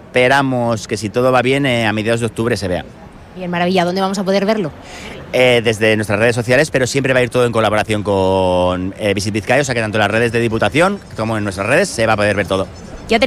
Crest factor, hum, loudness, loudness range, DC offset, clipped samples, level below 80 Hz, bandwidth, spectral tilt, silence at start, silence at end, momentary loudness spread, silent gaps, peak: 14 dB; none; -15 LUFS; 3 LU; under 0.1%; under 0.1%; -44 dBFS; 15 kHz; -5 dB/octave; 0 s; 0 s; 8 LU; none; 0 dBFS